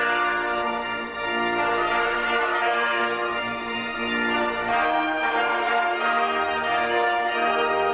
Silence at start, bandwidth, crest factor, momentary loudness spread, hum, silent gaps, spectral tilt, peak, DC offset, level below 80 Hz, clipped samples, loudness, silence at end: 0 s; 4 kHz; 14 dB; 5 LU; none; none; -7 dB/octave; -10 dBFS; under 0.1%; -54 dBFS; under 0.1%; -23 LUFS; 0 s